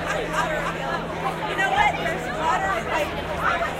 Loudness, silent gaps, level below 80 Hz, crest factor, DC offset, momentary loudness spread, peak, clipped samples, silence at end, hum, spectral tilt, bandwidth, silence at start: -24 LUFS; none; -42 dBFS; 18 dB; under 0.1%; 7 LU; -6 dBFS; under 0.1%; 0 s; none; -4 dB/octave; 16 kHz; 0 s